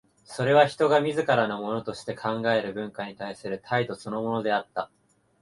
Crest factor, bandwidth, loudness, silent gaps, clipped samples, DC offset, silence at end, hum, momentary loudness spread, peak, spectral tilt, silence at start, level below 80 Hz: 22 dB; 11.5 kHz; -26 LUFS; none; under 0.1%; under 0.1%; 0.55 s; none; 14 LU; -6 dBFS; -5.5 dB/octave; 0.3 s; -66 dBFS